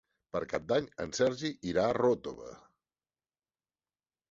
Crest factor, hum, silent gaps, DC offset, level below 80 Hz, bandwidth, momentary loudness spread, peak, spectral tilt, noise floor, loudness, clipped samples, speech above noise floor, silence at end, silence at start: 18 dB; none; none; under 0.1%; -64 dBFS; 7.8 kHz; 13 LU; -16 dBFS; -5 dB/octave; under -90 dBFS; -32 LUFS; under 0.1%; over 58 dB; 1.75 s; 0.35 s